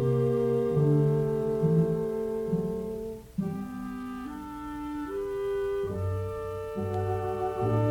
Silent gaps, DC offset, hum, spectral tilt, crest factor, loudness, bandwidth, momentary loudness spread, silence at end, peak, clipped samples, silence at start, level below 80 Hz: none; under 0.1%; none; -9 dB/octave; 16 dB; -30 LUFS; 17.5 kHz; 12 LU; 0 s; -14 dBFS; under 0.1%; 0 s; -50 dBFS